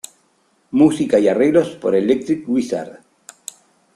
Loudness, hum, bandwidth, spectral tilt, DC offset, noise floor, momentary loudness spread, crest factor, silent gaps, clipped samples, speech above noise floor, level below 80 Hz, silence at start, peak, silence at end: -17 LUFS; none; 13 kHz; -6 dB/octave; under 0.1%; -61 dBFS; 21 LU; 16 dB; none; under 0.1%; 45 dB; -58 dBFS; 0.75 s; -2 dBFS; 1.05 s